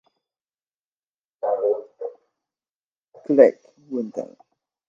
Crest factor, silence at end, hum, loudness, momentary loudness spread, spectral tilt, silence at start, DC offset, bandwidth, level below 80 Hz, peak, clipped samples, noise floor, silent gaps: 24 dB; 0.65 s; none; -21 LUFS; 20 LU; -8 dB/octave; 1.45 s; under 0.1%; 7.2 kHz; -84 dBFS; 0 dBFS; under 0.1%; under -90 dBFS; 2.69-3.02 s, 3.08-3.12 s